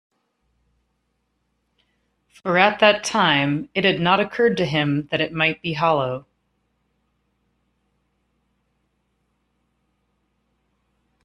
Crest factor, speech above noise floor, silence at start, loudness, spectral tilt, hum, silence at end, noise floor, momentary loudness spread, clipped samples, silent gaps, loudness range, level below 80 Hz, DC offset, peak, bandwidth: 24 dB; 52 dB; 2.45 s; -19 LUFS; -5 dB/octave; none; 5.05 s; -72 dBFS; 6 LU; under 0.1%; none; 7 LU; -60 dBFS; under 0.1%; 0 dBFS; 12.5 kHz